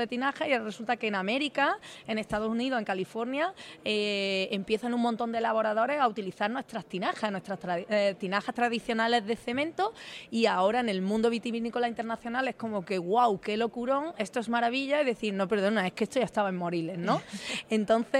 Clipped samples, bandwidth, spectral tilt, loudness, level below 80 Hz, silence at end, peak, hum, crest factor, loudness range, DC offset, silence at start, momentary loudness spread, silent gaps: under 0.1%; 12.5 kHz; -5 dB/octave; -30 LUFS; -66 dBFS; 0 s; -12 dBFS; none; 16 dB; 2 LU; under 0.1%; 0 s; 6 LU; none